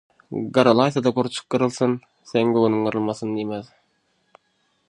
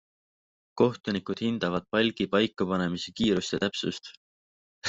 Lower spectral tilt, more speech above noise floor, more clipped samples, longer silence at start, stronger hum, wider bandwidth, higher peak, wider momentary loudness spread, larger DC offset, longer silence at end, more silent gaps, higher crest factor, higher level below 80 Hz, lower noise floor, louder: about the same, -6 dB/octave vs -5 dB/octave; second, 47 dB vs over 62 dB; neither; second, 0.3 s vs 0.75 s; neither; first, 10.5 kHz vs 8 kHz; first, -2 dBFS vs -8 dBFS; first, 13 LU vs 7 LU; neither; first, 1.25 s vs 0 s; second, none vs 4.17-4.82 s; about the same, 22 dB vs 20 dB; about the same, -66 dBFS vs -62 dBFS; second, -68 dBFS vs under -90 dBFS; first, -21 LUFS vs -28 LUFS